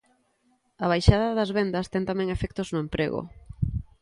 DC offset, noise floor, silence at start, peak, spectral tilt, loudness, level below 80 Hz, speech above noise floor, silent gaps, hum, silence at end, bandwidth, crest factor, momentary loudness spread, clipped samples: under 0.1%; -68 dBFS; 0.8 s; -2 dBFS; -7 dB/octave; -26 LUFS; -36 dBFS; 43 dB; none; none; 0.2 s; 11.5 kHz; 24 dB; 10 LU; under 0.1%